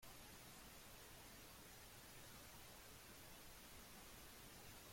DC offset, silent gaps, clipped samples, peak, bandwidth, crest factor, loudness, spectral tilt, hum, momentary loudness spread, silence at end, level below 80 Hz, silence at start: under 0.1%; none; under 0.1%; -48 dBFS; 16.5 kHz; 14 dB; -59 LUFS; -2.5 dB/octave; none; 1 LU; 0 s; -70 dBFS; 0 s